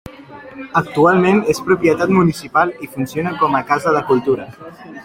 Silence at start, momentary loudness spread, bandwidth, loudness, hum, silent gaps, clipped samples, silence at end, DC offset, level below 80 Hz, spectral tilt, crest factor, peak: 0.05 s; 20 LU; 16.5 kHz; -16 LUFS; none; none; under 0.1%; 0 s; under 0.1%; -50 dBFS; -6.5 dB/octave; 16 dB; 0 dBFS